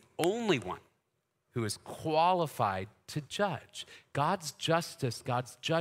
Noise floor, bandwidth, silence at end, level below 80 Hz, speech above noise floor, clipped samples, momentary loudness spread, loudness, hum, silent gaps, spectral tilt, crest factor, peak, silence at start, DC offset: -80 dBFS; 16 kHz; 0 s; -70 dBFS; 48 dB; under 0.1%; 13 LU; -33 LUFS; none; none; -5 dB/octave; 24 dB; -10 dBFS; 0.2 s; under 0.1%